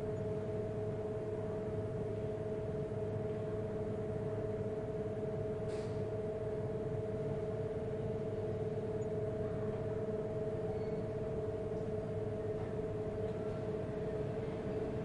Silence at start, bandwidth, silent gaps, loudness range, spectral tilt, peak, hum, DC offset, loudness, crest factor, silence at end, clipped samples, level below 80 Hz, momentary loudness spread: 0 s; 10.5 kHz; none; 1 LU; -9 dB/octave; -26 dBFS; none; under 0.1%; -40 LUFS; 12 dB; 0 s; under 0.1%; -56 dBFS; 1 LU